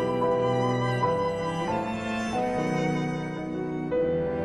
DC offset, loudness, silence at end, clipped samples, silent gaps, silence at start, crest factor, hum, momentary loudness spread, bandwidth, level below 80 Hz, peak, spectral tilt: under 0.1%; -27 LUFS; 0 s; under 0.1%; none; 0 s; 14 dB; none; 6 LU; 11.5 kHz; -52 dBFS; -14 dBFS; -6.5 dB/octave